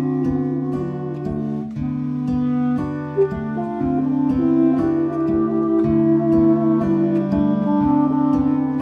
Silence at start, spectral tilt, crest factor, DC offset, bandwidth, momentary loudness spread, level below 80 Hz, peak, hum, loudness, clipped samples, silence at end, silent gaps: 0 s; -10.5 dB/octave; 14 dB; under 0.1%; 5.2 kHz; 8 LU; -44 dBFS; -6 dBFS; none; -19 LUFS; under 0.1%; 0 s; none